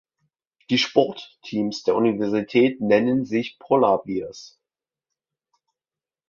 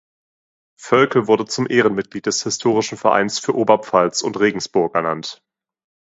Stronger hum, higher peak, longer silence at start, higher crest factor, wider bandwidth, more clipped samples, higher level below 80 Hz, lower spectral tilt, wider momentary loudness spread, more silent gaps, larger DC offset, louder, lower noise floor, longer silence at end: neither; about the same, -2 dBFS vs 0 dBFS; about the same, 0.7 s vs 0.8 s; about the same, 20 dB vs 18 dB; second, 7.2 kHz vs 8 kHz; neither; about the same, -64 dBFS vs -62 dBFS; first, -5.5 dB/octave vs -4 dB/octave; first, 11 LU vs 6 LU; neither; neither; second, -22 LUFS vs -18 LUFS; about the same, under -90 dBFS vs under -90 dBFS; first, 1.8 s vs 0.8 s